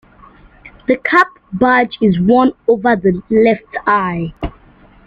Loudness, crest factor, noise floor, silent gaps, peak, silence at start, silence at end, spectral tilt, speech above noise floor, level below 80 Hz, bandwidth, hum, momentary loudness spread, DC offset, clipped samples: -14 LUFS; 14 dB; -45 dBFS; none; -2 dBFS; 0.65 s; 0.55 s; -8 dB/octave; 32 dB; -40 dBFS; 7.6 kHz; none; 11 LU; under 0.1%; under 0.1%